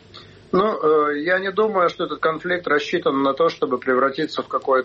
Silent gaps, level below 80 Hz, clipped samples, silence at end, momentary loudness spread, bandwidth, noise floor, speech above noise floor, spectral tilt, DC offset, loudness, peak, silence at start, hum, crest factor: none; -60 dBFS; under 0.1%; 0 s; 5 LU; 7.4 kHz; -44 dBFS; 24 dB; -6 dB/octave; under 0.1%; -20 LUFS; -8 dBFS; 0.15 s; none; 12 dB